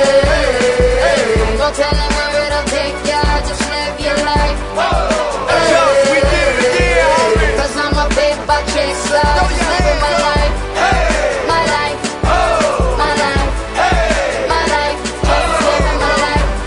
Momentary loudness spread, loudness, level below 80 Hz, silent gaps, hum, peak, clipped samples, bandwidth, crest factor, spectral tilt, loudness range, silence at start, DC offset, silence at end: 5 LU; -13 LUFS; -20 dBFS; none; none; 0 dBFS; under 0.1%; 11 kHz; 14 dB; -4 dB/octave; 3 LU; 0 s; under 0.1%; 0 s